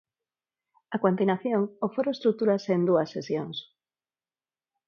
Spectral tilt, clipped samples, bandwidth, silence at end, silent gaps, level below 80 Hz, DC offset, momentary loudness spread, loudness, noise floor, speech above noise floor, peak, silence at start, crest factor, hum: -7.5 dB/octave; under 0.1%; 7 kHz; 1.25 s; none; -76 dBFS; under 0.1%; 8 LU; -27 LUFS; under -90 dBFS; over 64 dB; -8 dBFS; 0.9 s; 20 dB; none